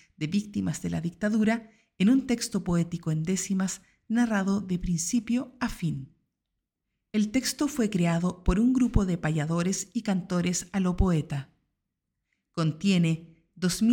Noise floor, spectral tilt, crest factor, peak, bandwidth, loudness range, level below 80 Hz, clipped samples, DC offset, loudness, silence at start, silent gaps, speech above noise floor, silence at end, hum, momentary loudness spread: -84 dBFS; -5.5 dB/octave; 20 dB; -6 dBFS; 17.5 kHz; 3 LU; -40 dBFS; under 0.1%; under 0.1%; -28 LUFS; 0.2 s; none; 57 dB; 0 s; none; 8 LU